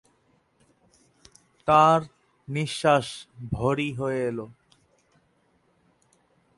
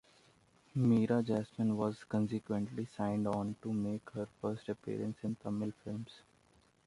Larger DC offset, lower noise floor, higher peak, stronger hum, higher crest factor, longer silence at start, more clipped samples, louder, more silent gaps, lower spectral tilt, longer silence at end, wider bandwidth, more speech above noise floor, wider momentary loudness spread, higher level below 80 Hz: neither; about the same, -67 dBFS vs -69 dBFS; first, -6 dBFS vs -20 dBFS; neither; about the same, 22 dB vs 18 dB; first, 1.65 s vs 0.75 s; neither; first, -24 LUFS vs -37 LUFS; neither; second, -5.5 dB/octave vs -8.5 dB/octave; first, 2.05 s vs 0.7 s; about the same, 11.5 kHz vs 11.5 kHz; first, 43 dB vs 33 dB; first, 19 LU vs 11 LU; first, -56 dBFS vs -68 dBFS